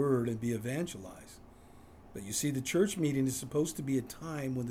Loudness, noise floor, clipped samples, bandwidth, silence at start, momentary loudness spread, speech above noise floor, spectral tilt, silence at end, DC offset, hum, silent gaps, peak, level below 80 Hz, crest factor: -34 LUFS; -55 dBFS; under 0.1%; 16.5 kHz; 0 s; 17 LU; 22 dB; -5.5 dB/octave; 0 s; under 0.1%; none; none; -16 dBFS; -62 dBFS; 18 dB